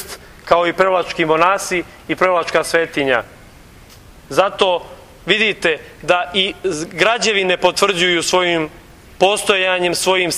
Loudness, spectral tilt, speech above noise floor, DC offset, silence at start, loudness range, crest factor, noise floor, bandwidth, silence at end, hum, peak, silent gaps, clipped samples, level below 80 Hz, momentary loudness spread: -16 LUFS; -3 dB/octave; 26 dB; under 0.1%; 0 s; 3 LU; 18 dB; -42 dBFS; 16 kHz; 0 s; none; 0 dBFS; none; under 0.1%; -48 dBFS; 9 LU